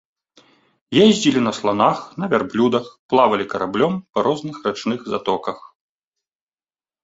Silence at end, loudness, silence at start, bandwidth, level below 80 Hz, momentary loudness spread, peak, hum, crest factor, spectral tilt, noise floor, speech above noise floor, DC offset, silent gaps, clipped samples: 1.45 s; -19 LUFS; 0.9 s; 8 kHz; -60 dBFS; 10 LU; -2 dBFS; none; 18 dB; -5 dB/octave; under -90 dBFS; over 71 dB; under 0.1%; 2.99-3.09 s; under 0.1%